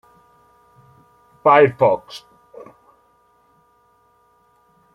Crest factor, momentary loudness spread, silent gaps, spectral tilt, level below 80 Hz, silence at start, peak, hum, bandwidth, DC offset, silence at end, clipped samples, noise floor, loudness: 20 dB; 25 LU; none; -7 dB/octave; -64 dBFS; 1.45 s; -2 dBFS; none; 11.5 kHz; under 0.1%; 2.8 s; under 0.1%; -58 dBFS; -16 LUFS